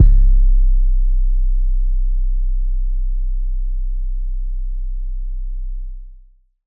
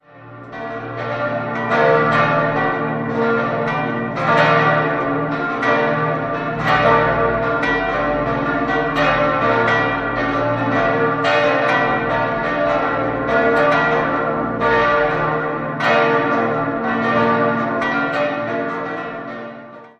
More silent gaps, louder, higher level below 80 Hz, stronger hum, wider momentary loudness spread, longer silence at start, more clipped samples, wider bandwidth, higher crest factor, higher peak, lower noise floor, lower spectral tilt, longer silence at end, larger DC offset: neither; second, -23 LUFS vs -17 LUFS; first, -14 dBFS vs -44 dBFS; neither; first, 12 LU vs 8 LU; second, 0 s vs 0.15 s; neither; second, 0.3 kHz vs 8.2 kHz; about the same, 14 dB vs 16 dB; about the same, 0 dBFS vs -2 dBFS; first, -46 dBFS vs -38 dBFS; first, -12 dB/octave vs -7 dB/octave; first, 0.5 s vs 0.1 s; neither